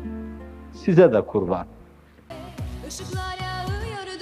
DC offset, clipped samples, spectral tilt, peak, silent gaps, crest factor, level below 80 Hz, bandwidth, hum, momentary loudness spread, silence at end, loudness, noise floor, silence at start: under 0.1%; under 0.1%; -6.5 dB/octave; -2 dBFS; none; 22 dB; -42 dBFS; 14.5 kHz; none; 24 LU; 0 s; -23 LUFS; -50 dBFS; 0 s